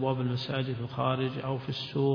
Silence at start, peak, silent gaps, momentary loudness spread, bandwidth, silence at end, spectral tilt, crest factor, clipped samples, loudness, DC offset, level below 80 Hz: 0 s; -14 dBFS; none; 4 LU; 5.4 kHz; 0 s; -8 dB/octave; 16 dB; under 0.1%; -32 LUFS; under 0.1%; -62 dBFS